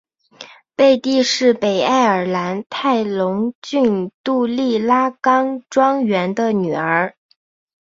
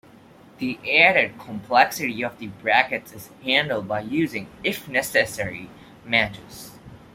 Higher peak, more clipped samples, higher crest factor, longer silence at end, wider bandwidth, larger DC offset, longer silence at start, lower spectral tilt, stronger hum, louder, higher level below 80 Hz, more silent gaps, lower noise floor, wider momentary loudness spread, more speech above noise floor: about the same, -2 dBFS vs -2 dBFS; neither; second, 16 dB vs 22 dB; first, 0.75 s vs 0.15 s; second, 7.8 kHz vs 16.5 kHz; neither; second, 0.4 s vs 0.6 s; first, -5 dB/octave vs -3.5 dB/octave; neither; first, -17 LUFS vs -22 LUFS; about the same, -62 dBFS vs -58 dBFS; first, 3.55-3.62 s, 4.14-4.24 s vs none; second, -42 dBFS vs -49 dBFS; second, 7 LU vs 20 LU; about the same, 25 dB vs 26 dB